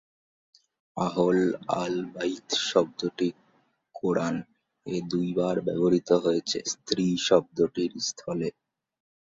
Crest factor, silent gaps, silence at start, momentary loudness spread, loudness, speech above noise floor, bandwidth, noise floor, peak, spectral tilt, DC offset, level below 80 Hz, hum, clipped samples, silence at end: 22 dB; none; 0.95 s; 9 LU; -27 LUFS; 41 dB; 7.8 kHz; -68 dBFS; -6 dBFS; -5 dB/octave; under 0.1%; -66 dBFS; none; under 0.1%; 0.9 s